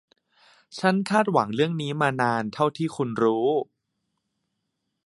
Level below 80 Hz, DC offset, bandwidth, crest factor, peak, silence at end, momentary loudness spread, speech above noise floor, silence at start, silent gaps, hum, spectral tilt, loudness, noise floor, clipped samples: -70 dBFS; under 0.1%; 11.5 kHz; 20 dB; -6 dBFS; 1.45 s; 7 LU; 55 dB; 0.7 s; none; none; -6.5 dB/octave; -24 LUFS; -79 dBFS; under 0.1%